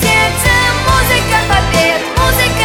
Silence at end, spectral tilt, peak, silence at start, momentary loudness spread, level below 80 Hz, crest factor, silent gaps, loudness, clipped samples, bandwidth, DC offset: 0 s; -3.5 dB/octave; 0 dBFS; 0 s; 2 LU; -22 dBFS; 10 dB; none; -11 LUFS; under 0.1%; 17 kHz; under 0.1%